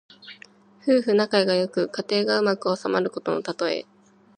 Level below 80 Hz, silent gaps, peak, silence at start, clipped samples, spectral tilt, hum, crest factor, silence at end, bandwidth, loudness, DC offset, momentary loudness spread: -76 dBFS; none; -6 dBFS; 0.25 s; under 0.1%; -5 dB/octave; none; 18 dB; 0.55 s; 9.6 kHz; -23 LUFS; under 0.1%; 11 LU